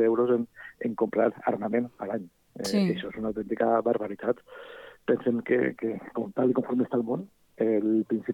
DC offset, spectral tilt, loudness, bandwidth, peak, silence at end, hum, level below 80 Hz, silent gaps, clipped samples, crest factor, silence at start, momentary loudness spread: under 0.1%; -7 dB/octave; -28 LUFS; 17.5 kHz; -10 dBFS; 0 s; none; -66 dBFS; none; under 0.1%; 16 dB; 0 s; 11 LU